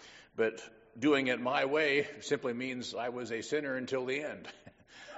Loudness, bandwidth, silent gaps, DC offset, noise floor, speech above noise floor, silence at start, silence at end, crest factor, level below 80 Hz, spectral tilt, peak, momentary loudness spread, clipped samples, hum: -33 LUFS; 8 kHz; none; under 0.1%; -53 dBFS; 20 dB; 0 s; 0 s; 20 dB; -74 dBFS; -2.5 dB/octave; -14 dBFS; 18 LU; under 0.1%; none